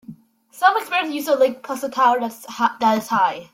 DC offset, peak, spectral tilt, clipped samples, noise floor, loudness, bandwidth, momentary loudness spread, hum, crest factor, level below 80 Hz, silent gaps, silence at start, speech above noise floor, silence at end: under 0.1%; -2 dBFS; -3.5 dB/octave; under 0.1%; -45 dBFS; -20 LUFS; 16.5 kHz; 6 LU; none; 18 dB; -68 dBFS; none; 0.1 s; 26 dB; 0.1 s